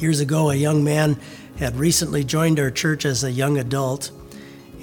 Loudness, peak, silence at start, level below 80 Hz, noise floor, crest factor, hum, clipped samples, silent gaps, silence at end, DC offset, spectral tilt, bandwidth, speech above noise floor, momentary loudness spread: -20 LUFS; -6 dBFS; 0 s; -44 dBFS; -40 dBFS; 16 dB; none; under 0.1%; none; 0 s; under 0.1%; -5 dB/octave; 19 kHz; 20 dB; 13 LU